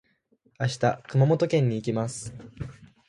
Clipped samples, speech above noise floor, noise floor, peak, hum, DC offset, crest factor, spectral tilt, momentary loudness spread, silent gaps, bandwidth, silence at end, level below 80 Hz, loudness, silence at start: under 0.1%; 41 dB; -66 dBFS; -8 dBFS; none; under 0.1%; 18 dB; -6.5 dB/octave; 18 LU; none; 11.5 kHz; 0.25 s; -56 dBFS; -25 LUFS; 0.6 s